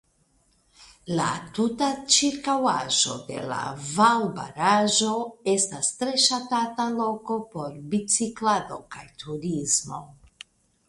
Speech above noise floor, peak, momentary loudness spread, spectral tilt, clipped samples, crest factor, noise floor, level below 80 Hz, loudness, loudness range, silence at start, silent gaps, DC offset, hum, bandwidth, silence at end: 40 dB; -6 dBFS; 15 LU; -2.5 dB/octave; under 0.1%; 20 dB; -65 dBFS; -62 dBFS; -24 LUFS; 5 LU; 0.8 s; none; under 0.1%; none; 11.5 kHz; 0.75 s